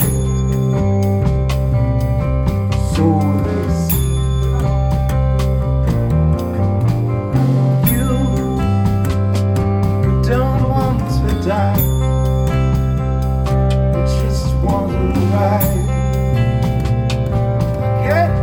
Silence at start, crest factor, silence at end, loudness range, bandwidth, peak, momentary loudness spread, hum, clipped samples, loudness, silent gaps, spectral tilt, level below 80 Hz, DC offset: 0 s; 14 dB; 0 s; 1 LU; 19.5 kHz; -2 dBFS; 3 LU; none; under 0.1%; -16 LUFS; none; -7.5 dB/octave; -22 dBFS; under 0.1%